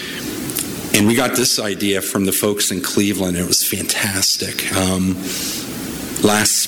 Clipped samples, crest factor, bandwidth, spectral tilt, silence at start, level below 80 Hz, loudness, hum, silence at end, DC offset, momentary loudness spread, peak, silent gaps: under 0.1%; 18 dB; over 20 kHz; -3 dB/octave; 0 s; -48 dBFS; -17 LUFS; none; 0 s; under 0.1%; 8 LU; 0 dBFS; none